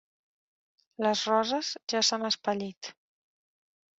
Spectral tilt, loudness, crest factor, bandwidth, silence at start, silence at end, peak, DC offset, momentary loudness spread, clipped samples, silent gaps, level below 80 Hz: -2.5 dB/octave; -28 LUFS; 20 dB; 8 kHz; 1 s; 1.05 s; -12 dBFS; under 0.1%; 13 LU; under 0.1%; 1.83-1.87 s, 2.77-2.81 s; -76 dBFS